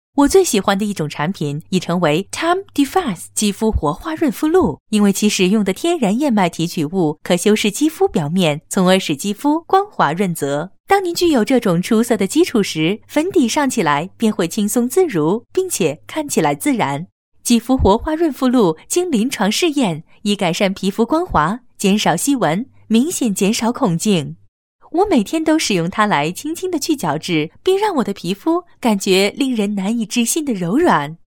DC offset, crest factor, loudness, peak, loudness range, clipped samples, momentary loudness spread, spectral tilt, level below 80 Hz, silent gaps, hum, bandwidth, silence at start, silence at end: under 0.1%; 16 dB; -17 LUFS; 0 dBFS; 2 LU; under 0.1%; 6 LU; -4.5 dB/octave; -40 dBFS; 4.80-4.86 s, 10.80-10.84 s, 17.12-17.32 s, 24.48-24.79 s; none; 17.5 kHz; 0.15 s; 0.2 s